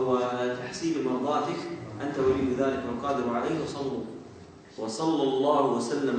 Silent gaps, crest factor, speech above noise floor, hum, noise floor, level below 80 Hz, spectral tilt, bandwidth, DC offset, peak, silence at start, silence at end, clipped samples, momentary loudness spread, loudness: none; 16 dB; 21 dB; none; -48 dBFS; -60 dBFS; -5.5 dB/octave; 9.4 kHz; under 0.1%; -12 dBFS; 0 s; 0 s; under 0.1%; 12 LU; -28 LUFS